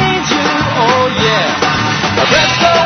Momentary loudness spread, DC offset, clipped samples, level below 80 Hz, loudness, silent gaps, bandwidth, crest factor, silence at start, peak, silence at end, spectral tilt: 3 LU; under 0.1%; under 0.1%; -38 dBFS; -11 LUFS; none; 6.6 kHz; 12 dB; 0 s; 0 dBFS; 0 s; -4 dB/octave